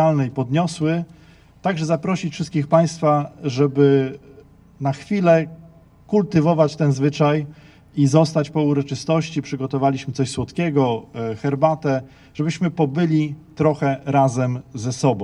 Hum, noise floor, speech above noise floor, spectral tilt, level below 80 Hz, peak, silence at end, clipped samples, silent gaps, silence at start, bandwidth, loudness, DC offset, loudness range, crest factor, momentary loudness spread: none; -47 dBFS; 28 dB; -7 dB/octave; -54 dBFS; -2 dBFS; 0 s; under 0.1%; none; 0 s; 11 kHz; -20 LUFS; under 0.1%; 3 LU; 18 dB; 10 LU